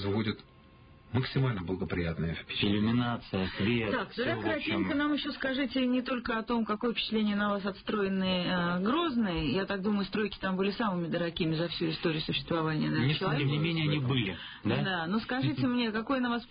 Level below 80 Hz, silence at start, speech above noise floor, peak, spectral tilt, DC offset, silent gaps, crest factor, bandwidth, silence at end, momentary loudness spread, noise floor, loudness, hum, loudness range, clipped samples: -52 dBFS; 0 s; 25 dB; -16 dBFS; -10.5 dB/octave; under 0.1%; none; 14 dB; 5.2 kHz; 0.05 s; 4 LU; -56 dBFS; -31 LUFS; none; 1 LU; under 0.1%